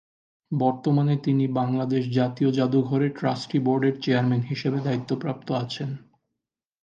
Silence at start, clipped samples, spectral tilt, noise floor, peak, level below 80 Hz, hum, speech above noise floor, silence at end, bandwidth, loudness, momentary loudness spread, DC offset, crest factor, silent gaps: 0.5 s; under 0.1%; -8 dB/octave; -85 dBFS; -8 dBFS; -68 dBFS; none; 61 dB; 0.85 s; 7.6 kHz; -25 LUFS; 7 LU; under 0.1%; 16 dB; none